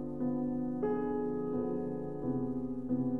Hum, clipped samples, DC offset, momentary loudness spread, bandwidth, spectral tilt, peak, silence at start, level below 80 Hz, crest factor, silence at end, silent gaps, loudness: none; under 0.1%; 0.4%; 3 LU; 2.7 kHz; -11.5 dB/octave; -22 dBFS; 0 s; -58 dBFS; 12 dB; 0 s; none; -35 LUFS